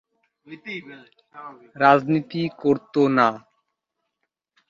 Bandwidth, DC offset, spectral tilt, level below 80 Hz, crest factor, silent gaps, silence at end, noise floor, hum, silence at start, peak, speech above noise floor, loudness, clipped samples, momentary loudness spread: 7.2 kHz; under 0.1%; -7.5 dB/octave; -68 dBFS; 22 dB; none; 1.3 s; -80 dBFS; none; 0.5 s; -2 dBFS; 58 dB; -20 LUFS; under 0.1%; 24 LU